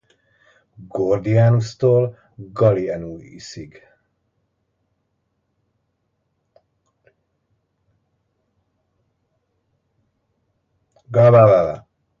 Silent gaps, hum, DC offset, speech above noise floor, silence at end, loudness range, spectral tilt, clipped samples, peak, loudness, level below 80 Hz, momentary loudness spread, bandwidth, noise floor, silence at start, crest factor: none; none; under 0.1%; 55 dB; 0.4 s; 20 LU; -8.5 dB/octave; under 0.1%; 0 dBFS; -16 LUFS; -54 dBFS; 24 LU; 7.4 kHz; -71 dBFS; 0.8 s; 20 dB